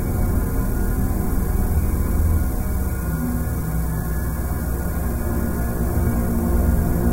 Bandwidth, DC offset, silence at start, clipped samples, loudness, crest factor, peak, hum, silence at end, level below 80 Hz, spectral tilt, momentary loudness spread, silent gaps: 16.5 kHz; 0.7%; 0 s; under 0.1%; -23 LUFS; 14 dB; -6 dBFS; none; 0 s; -22 dBFS; -7.5 dB/octave; 4 LU; none